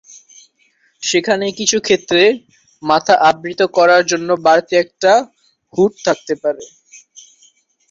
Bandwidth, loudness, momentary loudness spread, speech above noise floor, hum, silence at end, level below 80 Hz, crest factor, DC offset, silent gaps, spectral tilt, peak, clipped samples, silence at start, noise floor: 7.8 kHz; -14 LUFS; 11 LU; 44 dB; none; 1.25 s; -60 dBFS; 16 dB; under 0.1%; none; -3 dB/octave; 0 dBFS; under 0.1%; 1 s; -58 dBFS